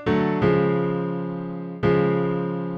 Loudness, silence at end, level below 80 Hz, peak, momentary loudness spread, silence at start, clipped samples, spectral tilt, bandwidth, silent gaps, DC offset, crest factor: -23 LUFS; 0 s; -48 dBFS; -8 dBFS; 9 LU; 0 s; under 0.1%; -9.5 dB/octave; 5.8 kHz; none; under 0.1%; 14 dB